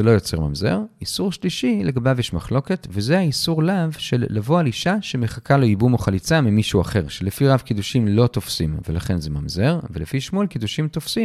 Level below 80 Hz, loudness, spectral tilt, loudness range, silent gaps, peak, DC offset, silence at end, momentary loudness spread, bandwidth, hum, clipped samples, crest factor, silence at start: -40 dBFS; -21 LUFS; -6 dB/octave; 3 LU; none; -2 dBFS; under 0.1%; 0 s; 7 LU; 15 kHz; none; under 0.1%; 18 dB; 0 s